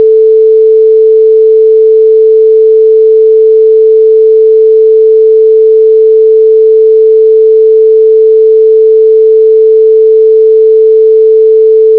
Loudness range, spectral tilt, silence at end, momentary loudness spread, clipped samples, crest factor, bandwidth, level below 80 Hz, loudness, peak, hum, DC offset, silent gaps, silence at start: 0 LU; -7 dB/octave; 0 s; 0 LU; under 0.1%; 4 dB; 0.5 kHz; -70 dBFS; -4 LUFS; 0 dBFS; none; 0.8%; none; 0 s